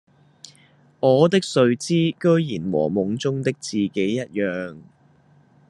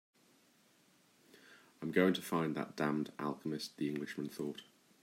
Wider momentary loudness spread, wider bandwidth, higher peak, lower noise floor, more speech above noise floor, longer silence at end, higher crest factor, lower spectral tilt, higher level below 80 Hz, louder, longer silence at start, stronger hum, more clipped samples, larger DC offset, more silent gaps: second, 8 LU vs 12 LU; second, 11 kHz vs 16 kHz; first, -2 dBFS vs -16 dBFS; second, -56 dBFS vs -70 dBFS; about the same, 35 dB vs 33 dB; first, 0.9 s vs 0.4 s; about the same, 20 dB vs 22 dB; about the same, -6 dB/octave vs -5.5 dB/octave; first, -66 dBFS vs -82 dBFS; first, -21 LUFS vs -38 LUFS; second, 1 s vs 1.35 s; neither; neither; neither; neither